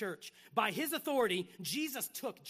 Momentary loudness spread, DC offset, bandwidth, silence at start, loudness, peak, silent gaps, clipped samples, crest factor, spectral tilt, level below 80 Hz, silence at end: 7 LU; under 0.1%; 15.5 kHz; 0 s; -36 LUFS; -18 dBFS; none; under 0.1%; 20 dB; -3 dB/octave; -84 dBFS; 0 s